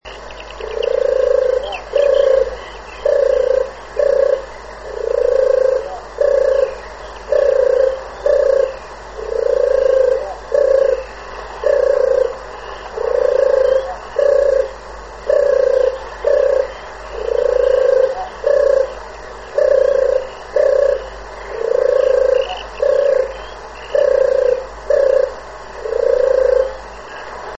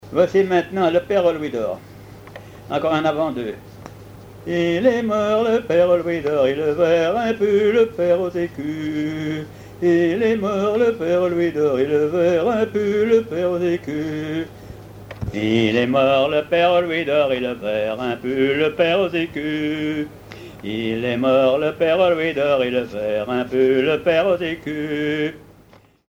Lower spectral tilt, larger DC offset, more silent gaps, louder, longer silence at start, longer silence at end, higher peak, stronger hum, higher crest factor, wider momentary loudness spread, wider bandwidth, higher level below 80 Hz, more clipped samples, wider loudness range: second, -4 dB/octave vs -6.5 dB/octave; first, 0.4% vs under 0.1%; neither; first, -16 LUFS vs -19 LUFS; about the same, 0.05 s vs 0.05 s; second, 0 s vs 0.7 s; about the same, -2 dBFS vs -2 dBFS; neither; about the same, 14 dB vs 16 dB; first, 17 LU vs 12 LU; second, 7.8 kHz vs 16 kHz; first, -40 dBFS vs -50 dBFS; neither; about the same, 1 LU vs 3 LU